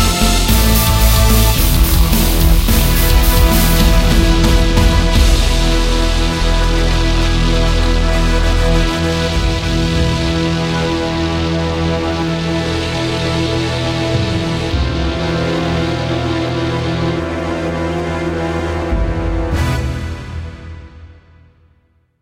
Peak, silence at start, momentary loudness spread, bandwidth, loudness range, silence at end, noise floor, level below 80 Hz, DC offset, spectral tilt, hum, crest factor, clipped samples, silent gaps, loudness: 0 dBFS; 0 s; 7 LU; 16 kHz; 7 LU; 1.1 s; -56 dBFS; -16 dBFS; under 0.1%; -5 dB/octave; none; 14 dB; under 0.1%; none; -15 LUFS